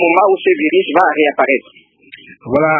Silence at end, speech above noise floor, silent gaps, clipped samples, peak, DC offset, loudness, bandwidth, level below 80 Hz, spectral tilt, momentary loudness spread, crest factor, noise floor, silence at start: 0 s; 27 dB; none; under 0.1%; 0 dBFS; under 0.1%; -13 LUFS; 4.5 kHz; -54 dBFS; -7.5 dB/octave; 7 LU; 14 dB; -40 dBFS; 0 s